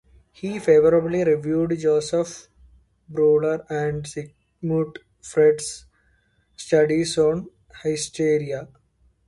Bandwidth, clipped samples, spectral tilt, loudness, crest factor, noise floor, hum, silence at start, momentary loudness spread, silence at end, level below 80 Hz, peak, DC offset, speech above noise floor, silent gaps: 11.5 kHz; under 0.1%; -5.5 dB/octave; -22 LUFS; 16 dB; -63 dBFS; none; 0.45 s; 15 LU; 0.6 s; -56 dBFS; -6 dBFS; under 0.1%; 43 dB; none